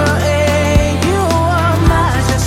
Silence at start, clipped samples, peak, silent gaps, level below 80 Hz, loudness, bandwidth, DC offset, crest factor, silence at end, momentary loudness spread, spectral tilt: 0 s; under 0.1%; 0 dBFS; none; -22 dBFS; -13 LUFS; 16 kHz; under 0.1%; 12 dB; 0 s; 2 LU; -5.5 dB/octave